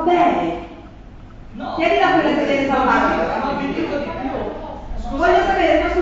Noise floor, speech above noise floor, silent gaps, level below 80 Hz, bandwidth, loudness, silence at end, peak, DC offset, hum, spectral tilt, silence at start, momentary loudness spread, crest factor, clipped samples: -38 dBFS; 21 dB; none; -34 dBFS; 7.8 kHz; -18 LUFS; 0 s; -4 dBFS; under 0.1%; none; -6 dB/octave; 0 s; 16 LU; 14 dB; under 0.1%